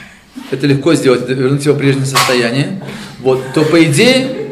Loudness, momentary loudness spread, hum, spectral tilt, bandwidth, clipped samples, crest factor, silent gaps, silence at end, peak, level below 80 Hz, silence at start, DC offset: -12 LUFS; 11 LU; none; -5 dB/octave; 15.5 kHz; under 0.1%; 12 dB; none; 0 s; 0 dBFS; -50 dBFS; 0 s; under 0.1%